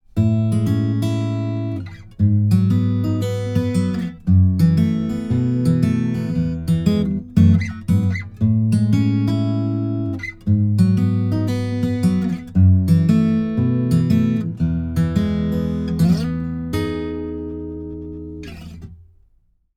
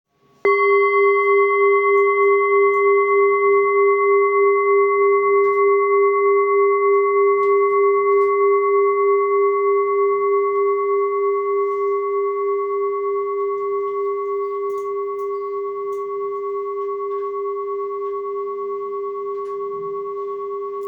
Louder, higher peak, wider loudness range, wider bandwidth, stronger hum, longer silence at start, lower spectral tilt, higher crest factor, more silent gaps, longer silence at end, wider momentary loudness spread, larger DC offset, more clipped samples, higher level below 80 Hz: about the same, -19 LUFS vs -18 LUFS; first, -2 dBFS vs -6 dBFS; second, 4 LU vs 10 LU; first, 13.5 kHz vs 4.5 kHz; neither; second, 0.15 s vs 0.45 s; first, -8.5 dB/octave vs -6.5 dB/octave; about the same, 16 dB vs 12 dB; neither; first, 0.8 s vs 0 s; about the same, 12 LU vs 11 LU; neither; neither; first, -42 dBFS vs -76 dBFS